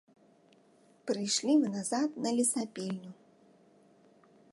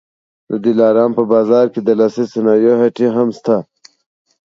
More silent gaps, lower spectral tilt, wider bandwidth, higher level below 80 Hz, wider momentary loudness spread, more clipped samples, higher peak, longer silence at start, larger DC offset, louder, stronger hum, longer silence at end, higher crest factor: neither; second, -3.5 dB/octave vs -8 dB/octave; first, 12 kHz vs 7.4 kHz; second, -86 dBFS vs -66 dBFS; first, 14 LU vs 6 LU; neither; second, -16 dBFS vs 0 dBFS; first, 1.05 s vs 0.5 s; neither; second, -31 LUFS vs -14 LUFS; neither; first, 1.4 s vs 0.85 s; about the same, 18 dB vs 14 dB